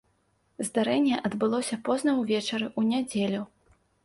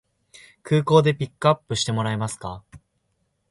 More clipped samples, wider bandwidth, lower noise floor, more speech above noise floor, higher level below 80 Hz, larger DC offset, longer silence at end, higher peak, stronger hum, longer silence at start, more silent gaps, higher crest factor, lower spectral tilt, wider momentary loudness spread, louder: neither; about the same, 11.5 kHz vs 11.5 kHz; about the same, -70 dBFS vs -72 dBFS; second, 43 dB vs 50 dB; second, -68 dBFS vs -54 dBFS; neither; second, 0.6 s vs 0.75 s; second, -14 dBFS vs -4 dBFS; neither; about the same, 0.6 s vs 0.65 s; neither; second, 14 dB vs 20 dB; about the same, -4.5 dB/octave vs -5.5 dB/octave; second, 6 LU vs 16 LU; second, -27 LUFS vs -22 LUFS